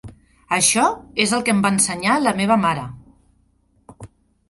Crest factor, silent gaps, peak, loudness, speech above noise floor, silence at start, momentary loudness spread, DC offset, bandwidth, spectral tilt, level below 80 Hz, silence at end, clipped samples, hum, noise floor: 18 dB; none; -2 dBFS; -18 LUFS; 42 dB; 0.05 s; 7 LU; under 0.1%; 12 kHz; -3 dB/octave; -52 dBFS; 0.45 s; under 0.1%; 60 Hz at -55 dBFS; -60 dBFS